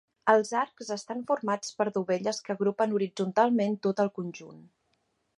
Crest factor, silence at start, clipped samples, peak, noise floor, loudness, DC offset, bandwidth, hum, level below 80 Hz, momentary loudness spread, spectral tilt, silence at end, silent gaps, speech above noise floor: 22 dB; 0.25 s; under 0.1%; -8 dBFS; -75 dBFS; -28 LUFS; under 0.1%; 11.5 kHz; none; -80 dBFS; 10 LU; -5 dB/octave; 0.8 s; none; 47 dB